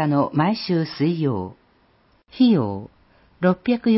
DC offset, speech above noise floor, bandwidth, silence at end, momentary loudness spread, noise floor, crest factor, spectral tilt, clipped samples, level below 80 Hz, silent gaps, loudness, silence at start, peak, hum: under 0.1%; 40 dB; 5.8 kHz; 0 s; 11 LU; -59 dBFS; 16 dB; -11 dB/octave; under 0.1%; -54 dBFS; none; -21 LUFS; 0 s; -6 dBFS; none